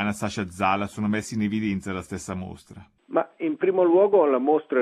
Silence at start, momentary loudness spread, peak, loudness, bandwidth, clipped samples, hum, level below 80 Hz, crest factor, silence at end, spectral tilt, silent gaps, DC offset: 0 s; 14 LU; -8 dBFS; -24 LUFS; 14 kHz; under 0.1%; none; -58 dBFS; 16 dB; 0 s; -6 dB/octave; none; under 0.1%